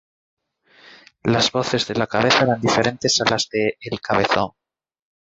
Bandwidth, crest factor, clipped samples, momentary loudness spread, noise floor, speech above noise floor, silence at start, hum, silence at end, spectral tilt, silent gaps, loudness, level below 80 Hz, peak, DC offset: 8.2 kHz; 18 dB; under 0.1%; 7 LU; -53 dBFS; 34 dB; 1.25 s; none; 0.9 s; -3.5 dB/octave; none; -19 LUFS; -52 dBFS; -4 dBFS; under 0.1%